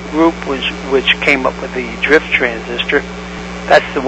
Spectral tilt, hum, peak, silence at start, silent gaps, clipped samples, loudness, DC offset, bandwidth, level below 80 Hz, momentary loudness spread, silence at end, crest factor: -4.5 dB/octave; 60 Hz at -30 dBFS; 0 dBFS; 0 s; none; 0.2%; -14 LUFS; under 0.1%; 11 kHz; -36 dBFS; 12 LU; 0 s; 14 dB